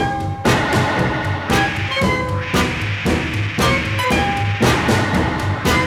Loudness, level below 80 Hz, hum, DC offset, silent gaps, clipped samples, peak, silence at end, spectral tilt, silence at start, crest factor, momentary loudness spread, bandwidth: -18 LUFS; -32 dBFS; none; under 0.1%; none; under 0.1%; -2 dBFS; 0 s; -5 dB/octave; 0 s; 16 dB; 4 LU; 17.5 kHz